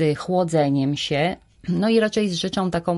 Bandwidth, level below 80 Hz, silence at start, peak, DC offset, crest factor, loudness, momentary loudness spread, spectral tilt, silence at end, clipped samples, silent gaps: 11.5 kHz; -52 dBFS; 0 s; -6 dBFS; under 0.1%; 14 dB; -21 LUFS; 5 LU; -6 dB/octave; 0 s; under 0.1%; none